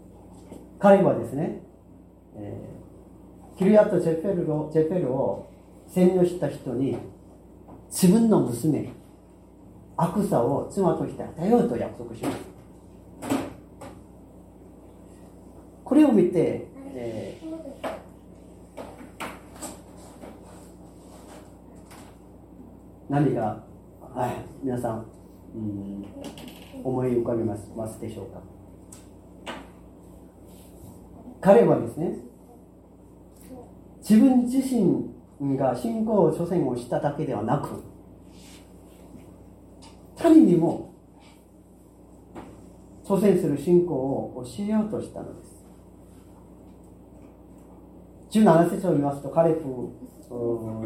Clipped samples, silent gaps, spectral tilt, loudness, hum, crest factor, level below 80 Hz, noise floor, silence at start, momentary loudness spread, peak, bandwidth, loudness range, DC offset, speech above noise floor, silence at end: under 0.1%; none; -7.5 dB/octave; -24 LUFS; none; 24 dB; -54 dBFS; -52 dBFS; 0.05 s; 27 LU; -2 dBFS; 16.5 kHz; 14 LU; under 0.1%; 29 dB; 0 s